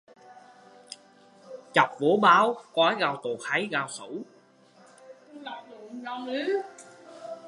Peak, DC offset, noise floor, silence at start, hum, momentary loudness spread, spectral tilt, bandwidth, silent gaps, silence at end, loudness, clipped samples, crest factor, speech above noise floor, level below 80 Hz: -4 dBFS; under 0.1%; -58 dBFS; 0.3 s; none; 25 LU; -4 dB/octave; 11.5 kHz; none; 0 s; -25 LUFS; under 0.1%; 24 dB; 32 dB; -82 dBFS